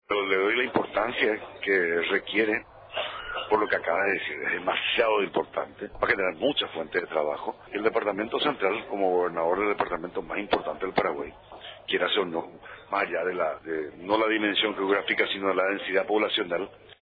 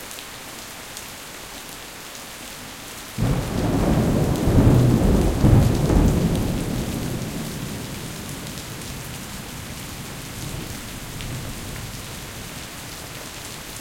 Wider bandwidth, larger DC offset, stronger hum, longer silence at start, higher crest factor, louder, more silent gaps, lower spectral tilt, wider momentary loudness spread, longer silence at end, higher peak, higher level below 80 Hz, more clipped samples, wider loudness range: second, 5 kHz vs 17 kHz; neither; neither; about the same, 0.1 s vs 0 s; about the same, 18 dB vs 22 dB; second, -27 LUFS vs -24 LUFS; neither; about the same, -7 dB/octave vs -6 dB/octave; second, 9 LU vs 17 LU; about the same, 0.1 s vs 0 s; second, -10 dBFS vs -2 dBFS; second, -60 dBFS vs -30 dBFS; neither; second, 3 LU vs 13 LU